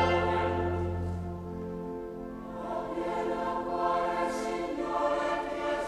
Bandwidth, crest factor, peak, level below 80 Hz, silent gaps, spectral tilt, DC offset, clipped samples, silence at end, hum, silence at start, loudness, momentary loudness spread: 12.5 kHz; 16 dB; -14 dBFS; -50 dBFS; none; -6.5 dB/octave; under 0.1%; under 0.1%; 0 s; none; 0 s; -32 LUFS; 10 LU